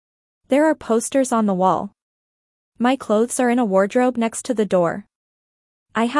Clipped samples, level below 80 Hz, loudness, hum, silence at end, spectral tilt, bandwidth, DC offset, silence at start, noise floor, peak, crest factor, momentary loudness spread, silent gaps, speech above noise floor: under 0.1%; -62 dBFS; -19 LUFS; none; 0 s; -5 dB/octave; 12 kHz; under 0.1%; 0.5 s; under -90 dBFS; -4 dBFS; 16 dB; 6 LU; 2.02-2.72 s, 5.15-5.86 s; over 72 dB